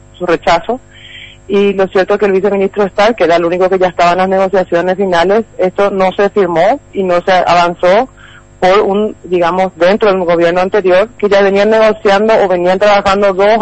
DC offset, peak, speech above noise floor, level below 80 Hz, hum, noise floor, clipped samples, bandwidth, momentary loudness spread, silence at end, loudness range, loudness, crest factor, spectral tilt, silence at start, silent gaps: 1%; -2 dBFS; 23 dB; -40 dBFS; none; -33 dBFS; under 0.1%; 8.6 kHz; 5 LU; 0 s; 2 LU; -10 LUFS; 10 dB; -5.5 dB/octave; 0.2 s; none